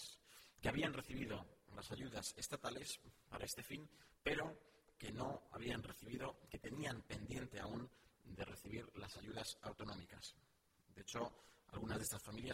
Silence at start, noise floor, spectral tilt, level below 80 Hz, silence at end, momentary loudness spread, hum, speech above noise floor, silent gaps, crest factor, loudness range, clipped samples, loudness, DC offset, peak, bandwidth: 0 s; -74 dBFS; -4 dB/octave; -66 dBFS; 0 s; 13 LU; none; 26 dB; none; 22 dB; 5 LU; under 0.1%; -49 LUFS; under 0.1%; -28 dBFS; 16 kHz